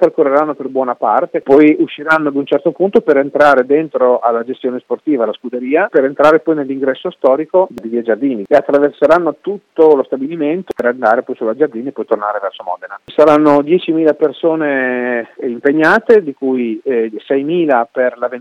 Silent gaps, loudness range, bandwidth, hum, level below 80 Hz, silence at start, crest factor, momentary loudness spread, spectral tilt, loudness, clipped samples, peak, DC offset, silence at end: none; 3 LU; 8.2 kHz; none; -58 dBFS; 0 s; 12 dB; 10 LU; -7 dB/octave; -13 LUFS; 0.2%; 0 dBFS; under 0.1%; 0 s